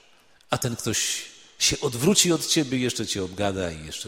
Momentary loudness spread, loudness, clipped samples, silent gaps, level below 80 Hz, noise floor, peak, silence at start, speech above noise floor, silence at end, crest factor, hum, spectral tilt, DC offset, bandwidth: 11 LU; -24 LUFS; under 0.1%; none; -50 dBFS; -56 dBFS; -4 dBFS; 0.5 s; 31 dB; 0 s; 20 dB; none; -3 dB/octave; under 0.1%; 16.5 kHz